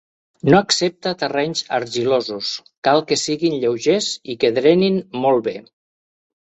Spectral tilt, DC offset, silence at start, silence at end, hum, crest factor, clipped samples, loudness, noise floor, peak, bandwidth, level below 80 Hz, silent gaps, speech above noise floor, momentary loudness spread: -4.5 dB/octave; under 0.1%; 0.45 s; 0.9 s; none; 20 dB; under 0.1%; -18 LUFS; under -90 dBFS; 0 dBFS; 8.4 kHz; -58 dBFS; 2.77-2.82 s; over 72 dB; 9 LU